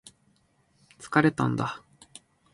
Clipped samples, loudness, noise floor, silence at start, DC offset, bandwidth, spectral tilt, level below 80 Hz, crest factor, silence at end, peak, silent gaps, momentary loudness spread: under 0.1%; -26 LUFS; -67 dBFS; 1 s; under 0.1%; 11.5 kHz; -6.5 dB/octave; -64 dBFS; 24 dB; 0.75 s; -6 dBFS; none; 26 LU